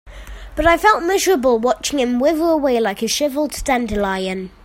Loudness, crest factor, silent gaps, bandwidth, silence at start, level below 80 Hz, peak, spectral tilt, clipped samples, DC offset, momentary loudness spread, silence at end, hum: -17 LUFS; 18 dB; none; 16.5 kHz; 0.05 s; -36 dBFS; 0 dBFS; -3.5 dB/octave; under 0.1%; under 0.1%; 8 LU; 0.15 s; none